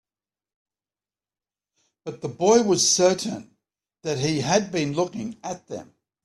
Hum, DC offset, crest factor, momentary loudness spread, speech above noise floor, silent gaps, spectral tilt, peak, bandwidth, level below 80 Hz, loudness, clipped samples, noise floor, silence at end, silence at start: none; under 0.1%; 20 dB; 20 LU; over 67 dB; none; -3.5 dB/octave; -4 dBFS; 13.5 kHz; -64 dBFS; -22 LUFS; under 0.1%; under -90 dBFS; 0.4 s; 2.05 s